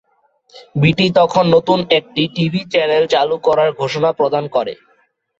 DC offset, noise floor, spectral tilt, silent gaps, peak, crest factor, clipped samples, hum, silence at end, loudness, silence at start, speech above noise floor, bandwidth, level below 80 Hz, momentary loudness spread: under 0.1%; -59 dBFS; -6.5 dB/octave; none; -2 dBFS; 14 dB; under 0.1%; none; 0.65 s; -15 LUFS; 0.55 s; 44 dB; 7.8 kHz; -52 dBFS; 7 LU